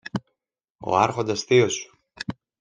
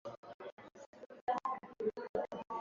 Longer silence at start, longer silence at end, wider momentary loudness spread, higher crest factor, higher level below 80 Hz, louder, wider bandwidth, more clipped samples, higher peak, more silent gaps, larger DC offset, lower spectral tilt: about the same, 0.05 s vs 0.05 s; first, 0.3 s vs 0 s; about the same, 16 LU vs 17 LU; about the same, 22 dB vs 18 dB; first, -60 dBFS vs -76 dBFS; first, -22 LUFS vs -42 LUFS; first, 9.8 kHz vs 7.4 kHz; neither; first, -4 dBFS vs -24 dBFS; second, 0.70-0.75 s vs 0.17-0.23 s, 0.34-0.39 s, 0.52-0.57 s, 0.86-0.93 s, 1.21-1.27 s, 2.09-2.14 s; neither; about the same, -4.5 dB/octave vs -4 dB/octave